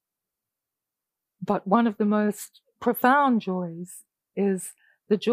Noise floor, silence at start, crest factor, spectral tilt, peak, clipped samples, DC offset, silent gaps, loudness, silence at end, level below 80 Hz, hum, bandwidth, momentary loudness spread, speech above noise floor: -87 dBFS; 1.4 s; 20 dB; -6 dB/octave; -6 dBFS; under 0.1%; under 0.1%; none; -24 LUFS; 0 s; -72 dBFS; none; 15.5 kHz; 18 LU; 63 dB